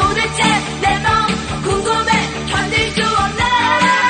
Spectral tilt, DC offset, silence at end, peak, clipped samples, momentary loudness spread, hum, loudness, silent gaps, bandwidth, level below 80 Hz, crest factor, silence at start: -3.5 dB/octave; under 0.1%; 0 s; 0 dBFS; under 0.1%; 5 LU; none; -15 LUFS; none; 9.6 kHz; -34 dBFS; 14 dB; 0 s